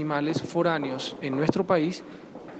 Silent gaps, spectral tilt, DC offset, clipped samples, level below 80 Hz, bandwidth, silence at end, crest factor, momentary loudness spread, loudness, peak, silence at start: none; -6 dB/octave; under 0.1%; under 0.1%; -66 dBFS; 8.6 kHz; 0 s; 20 dB; 14 LU; -27 LUFS; -6 dBFS; 0 s